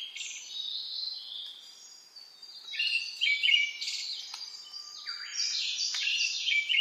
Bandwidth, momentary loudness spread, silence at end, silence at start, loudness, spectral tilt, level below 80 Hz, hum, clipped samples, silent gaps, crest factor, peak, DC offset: 15.5 kHz; 21 LU; 0 s; 0 s; -30 LUFS; 6 dB/octave; under -90 dBFS; none; under 0.1%; none; 20 dB; -12 dBFS; under 0.1%